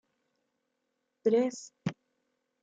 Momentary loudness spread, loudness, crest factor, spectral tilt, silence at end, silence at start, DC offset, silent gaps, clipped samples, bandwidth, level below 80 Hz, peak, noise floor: 11 LU; -32 LUFS; 20 dB; -6 dB/octave; 0.7 s; 1.25 s; under 0.1%; none; under 0.1%; 8.8 kHz; -76 dBFS; -14 dBFS; -82 dBFS